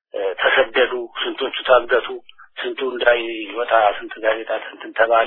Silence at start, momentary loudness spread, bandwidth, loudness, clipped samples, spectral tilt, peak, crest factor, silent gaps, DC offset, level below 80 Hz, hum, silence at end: 0.15 s; 12 LU; 4.2 kHz; -19 LUFS; under 0.1%; -6 dB/octave; 0 dBFS; 20 dB; none; under 0.1%; -56 dBFS; none; 0 s